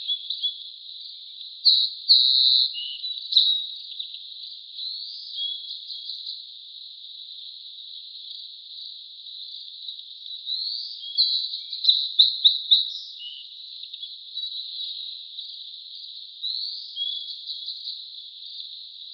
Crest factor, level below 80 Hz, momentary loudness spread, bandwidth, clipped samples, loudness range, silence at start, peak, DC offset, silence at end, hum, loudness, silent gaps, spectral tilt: 22 dB; under -90 dBFS; 20 LU; 6.2 kHz; under 0.1%; 17 LU; 0 s; -4 dBFS; under 0.1%; 0 s; none; -22 LUFS; none; 12.5 dB/octave